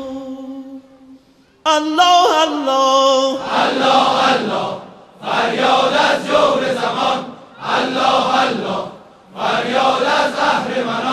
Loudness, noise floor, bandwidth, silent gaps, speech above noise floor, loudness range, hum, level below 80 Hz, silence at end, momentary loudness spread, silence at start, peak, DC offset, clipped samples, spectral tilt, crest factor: -15 LUFS; -50 dBFS; 14 kHz; none; 35 dB; 4 LU; none; -56 dBFS; 0 s; 16 LU; 0 s; 0 dBFS; under 0.1%; under 0.1%; -3 dB/octave; 16 dB